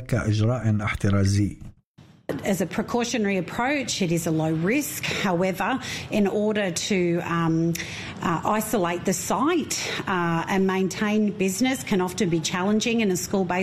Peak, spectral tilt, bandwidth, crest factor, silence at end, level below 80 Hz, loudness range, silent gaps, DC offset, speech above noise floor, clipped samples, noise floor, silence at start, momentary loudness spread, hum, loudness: -10 dBFS; -5 dB/octave; 15 kHz; 14 dB; 0 s; -50 dBFS; 2 LU; 1.84-1.94 s; under 0.1%; 29 dB; under 0.1%; -53 dBFS; 0 s; 4 LU; none; -24 LUFS